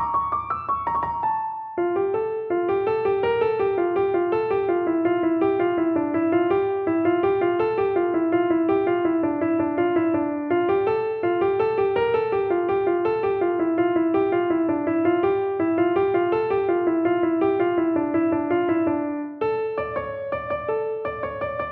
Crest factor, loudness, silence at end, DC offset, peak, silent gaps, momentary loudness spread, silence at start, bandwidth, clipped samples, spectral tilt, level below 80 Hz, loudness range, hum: 14 dB; -23 LUFS; 0 s; under 0.1%; -8 dBFS; none; 5 LU; 0 s; 4.3 kHz; under 0.1%; -9.5 dB/octave; -54 dBFS; 2 LU; none